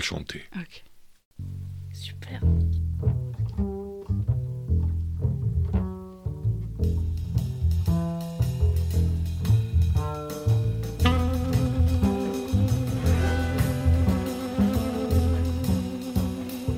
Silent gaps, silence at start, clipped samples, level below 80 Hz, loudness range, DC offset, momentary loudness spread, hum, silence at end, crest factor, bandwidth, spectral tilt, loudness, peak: 1.25-1.31 s; 0 s; under 0.1%; -32 dBFS; 4 LU; under 0.1%; 13 LU; none; 0 s; 18 dB; 16 kHz; -7 dB/octave; -26 LUFS; -8 dBFS